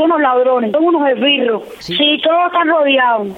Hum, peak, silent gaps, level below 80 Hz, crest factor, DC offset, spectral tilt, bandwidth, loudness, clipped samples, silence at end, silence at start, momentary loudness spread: none; -2 dBFS; none; -58 dBFS; 10 dB; under 0.1%; -5 dB/octave; 7.8 kHz; -13 LUFS; under 0.1%; 0 s; 0 s; 3 LU